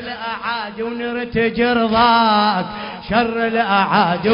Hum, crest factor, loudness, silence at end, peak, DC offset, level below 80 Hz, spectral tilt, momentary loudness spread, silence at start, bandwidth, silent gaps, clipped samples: none; 16 dB; -17 LUFS; 0 s; 0 dBFS; under 0.1%; -46 dBFS; -9.5 dB/octave; 11 LU; 0 s; 5.4 kHz; none; under 0.1%